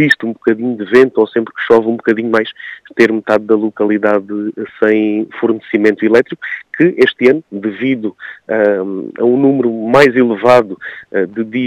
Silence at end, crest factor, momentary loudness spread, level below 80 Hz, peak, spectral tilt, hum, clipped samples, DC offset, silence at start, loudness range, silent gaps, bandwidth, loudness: 0 s; 12 dB; 12 LU; -56 dBFS; 0 dBFS; -6.5 dB/octave; none; 0.4%; under 0.1%; 0 s; 2 LU; none; 11.5 kHz; -13 LUFS